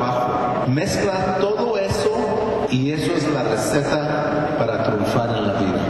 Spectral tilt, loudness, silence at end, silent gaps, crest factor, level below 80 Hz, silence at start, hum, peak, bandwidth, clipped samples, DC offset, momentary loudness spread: -6 dB/octave; -20 LUFS; 0 s; none; 12 dB; -42 dBFS; 0 s; none; -8 dBFS; 12.5 kHz; under 0.1%; under 0.1%; 1 LU